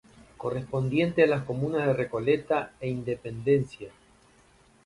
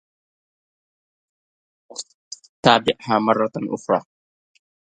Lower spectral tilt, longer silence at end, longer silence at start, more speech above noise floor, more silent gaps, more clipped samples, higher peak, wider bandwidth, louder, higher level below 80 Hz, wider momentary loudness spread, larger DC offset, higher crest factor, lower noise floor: first, -8 dB/octave vs -4.5 dB/octave; about the same, 0.95 s vs 0.9 s; second, 0.4 s vs 1.95 s; second, 33 dB vs over 71 dB; second, none vs 2.14-2.31 s, 2.49-2.63 s; neither; second, -8 dBFS vs 0 dBFS; about the same, 11.5 kHz vs 11 kHz; second, -27 LUFS vs -20 LUFS; first, -58 dBFS vs -64 dBFS; second, 11 LU vs 20 LU; neither; about the same, 20 dB vs 24 dB; second, -60 dBFS vs under -90 dBFS